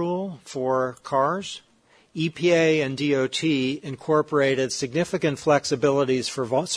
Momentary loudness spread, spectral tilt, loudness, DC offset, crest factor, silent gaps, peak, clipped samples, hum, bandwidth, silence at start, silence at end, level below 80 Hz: 9 LU; -5 dB/octave; -23 LUFS; under 0.1%; 18 dB; none; -6 dBFS; under 0.1%; none; 11 kHz; 0 s; 0 s; -62 dBFS